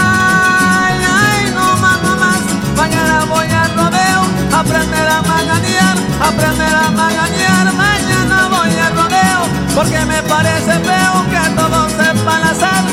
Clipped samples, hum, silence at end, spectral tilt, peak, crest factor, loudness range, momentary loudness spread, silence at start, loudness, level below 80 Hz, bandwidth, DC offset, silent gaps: under 0.1%; none; 0 s; -4 dB/octave; 0 dBFS; 12 dB; 1 LU; 3 LU; 0 s; -11 LUFS; -32 dBFS; 16.5 kHz; under 0.1%; none